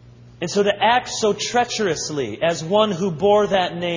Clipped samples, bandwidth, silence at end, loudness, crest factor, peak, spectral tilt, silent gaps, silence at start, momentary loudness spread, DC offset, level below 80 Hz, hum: under 0.1%; 7.6 kHz; 0 s; -19 LUFS; 18 dB; -2 dBFS; -4 dB/octave; none; 0.05 s; 6 LU; under 0.1%; -54 dBFS; none